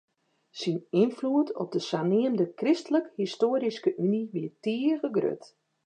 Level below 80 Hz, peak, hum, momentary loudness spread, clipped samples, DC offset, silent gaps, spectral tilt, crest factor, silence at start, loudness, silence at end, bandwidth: -82 dBFS; -12 dBFS; none; 7 LU; under 0.1%; under 0.1%; none; -7 dB/octave; 16 dB; 0.55 s; -28 LUFS; 0.5 s; 9.4 kHz